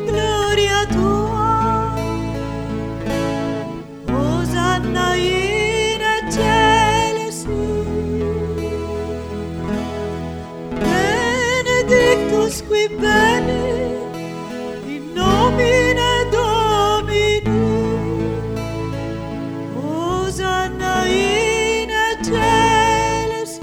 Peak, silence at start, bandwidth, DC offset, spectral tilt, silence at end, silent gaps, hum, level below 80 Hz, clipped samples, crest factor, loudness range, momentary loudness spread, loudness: 0 dBFS; 0 s; 17 kHz; under 0.1%; -4.5 dB/octave; 0 s; none; none; -32 dBFS; under 0.1%; 18 dB; 5 LU; 12 LU; -18 LUFS